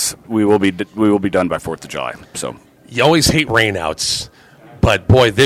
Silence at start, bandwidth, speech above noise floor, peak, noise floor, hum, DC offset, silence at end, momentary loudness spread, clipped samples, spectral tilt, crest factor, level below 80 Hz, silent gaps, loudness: 0 s; 16 kHz; 27 dB; 0 dBFS; -42 dBFS; none; under 0.1%; 0 s; 14 LU; under 0.1%; -4.5 dB/octave; 16 dB; -34 dBFS; none; -16 LUFS